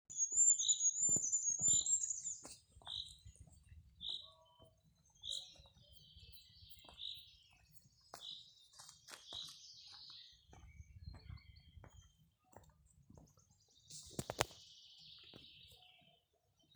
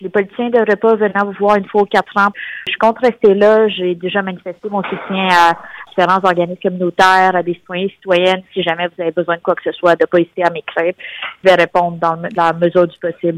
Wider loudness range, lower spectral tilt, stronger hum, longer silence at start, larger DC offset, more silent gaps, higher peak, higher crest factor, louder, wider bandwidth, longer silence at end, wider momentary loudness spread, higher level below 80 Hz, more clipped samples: first, 23 LU vs 2 LU; second, 0 dB/octave vs -5.5 dB/octave; neither; about the same, 0.1 s vs 0 s; neither; neither; second, -10 dBFS vs 0 dBFS; first, 34 dB vs 14 dB; second, -36 LUFS vs -14 LUFS; first, over 20 kHz vs 14 kHz; first, 1 s vs 0 s; first, 27 LU vs 10 LU; second, -68 dBFS vs -56 dBFS; neither